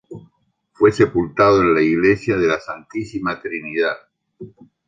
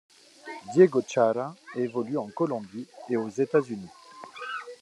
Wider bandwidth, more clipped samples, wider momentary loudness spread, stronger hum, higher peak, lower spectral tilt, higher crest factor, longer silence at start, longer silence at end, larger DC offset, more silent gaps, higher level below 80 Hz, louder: second, 7.6 kHz vs 11 kHz; neither; second, 13 LU vs 21 LU; neither; first, -2 dBFS vs -6 dBFS; about the same, -7 dB/octave vs -6.5 dB/octave; about the same, 18 dB vs 22 dB; second, 0.1 s vs 0.45 s; first, 0.4 s vs 0.05 s; neither; neither; first, -48 dBFS vs -80 dBFS; first, -18 LUFS vs -27 LUFS